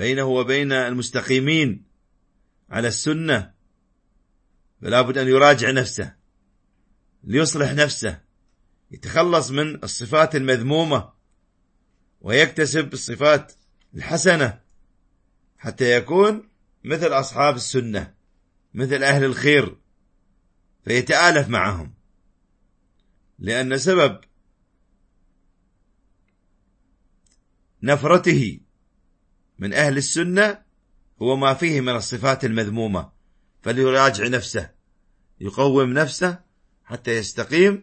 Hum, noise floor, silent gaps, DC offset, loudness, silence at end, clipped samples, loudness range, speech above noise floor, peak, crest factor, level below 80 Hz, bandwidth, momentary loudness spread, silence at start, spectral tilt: none; -65 dBFS; none; under 0.1%; -20 LUFS; 0 s; under 0.1%; 5 LU; 45 dB; 0 dBFS; 22 dB; -54 dBFS; 8.8 kHz; 15 LU; 0 s; -4.5 dB/octave